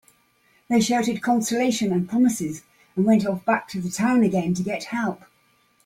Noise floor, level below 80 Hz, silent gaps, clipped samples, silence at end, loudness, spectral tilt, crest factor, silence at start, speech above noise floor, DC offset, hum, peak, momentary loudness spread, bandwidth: -62 dBFS; -62 dBFS; none; under 0.1%; 0.7 s; -23 LUFS; -5 dB/octave; 16 dB; 0.7 s; 41 dB; under 0.1%; none; -6 dBFS; 10 LU; 16 kHz